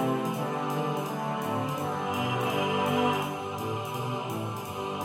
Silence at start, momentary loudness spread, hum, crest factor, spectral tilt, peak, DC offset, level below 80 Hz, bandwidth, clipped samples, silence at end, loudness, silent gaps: 0 s; 7 LU; none; 16 dB; -5.5 dB/octave; -14 dBFS; under 0.1%; -68 dBFS; 16.5 kHz; under 0.1%; 0 s; -30 LUFS; none